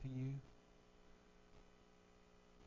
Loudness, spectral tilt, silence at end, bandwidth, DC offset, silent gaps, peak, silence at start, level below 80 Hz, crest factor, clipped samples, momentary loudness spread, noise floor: -49 LUFS; -8.5 dB/octave; 0 s; 7.2 kHz; under 0.1%; none; -36 dBFS; 0 s; -68 dBFS; 18 dB; under 0.1%; 22 LU; -68 dBFS